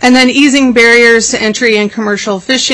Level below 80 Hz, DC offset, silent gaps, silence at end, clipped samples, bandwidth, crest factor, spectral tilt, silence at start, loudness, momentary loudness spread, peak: -42 dBFS; under 0.1%; none; 0 s; 0.3%; 11 kHz; 8 dB; -2.5 dB/octave; 0 s; -7 LUFS; 9 LU; 0 dBFS